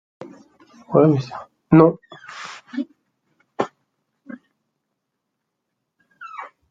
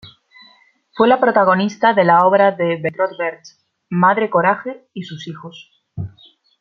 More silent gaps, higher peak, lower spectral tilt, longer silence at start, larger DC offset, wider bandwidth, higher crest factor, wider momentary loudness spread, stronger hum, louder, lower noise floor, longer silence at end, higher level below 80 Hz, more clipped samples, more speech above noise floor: neither; about the same, -2 dBFS vs -2 dBFS; first, -8.5 dB/octave vs -7 dB/octave; first, 0.9 s vs 0.05 s; neither; about the same, 7.6 kHz vs 7.2 kHz; first, 22 dB vs 16 dB; first, 28 LU vs 19 LU; neither; second, -19 LUFS vs -15 LUFS; first, -78 dBFS vs -53 dBFS; second, 0.25 s vs 0.5 s; about the same, -60 dBFS vs -60 dBFS; neither; first, 62 dB vs 37 dB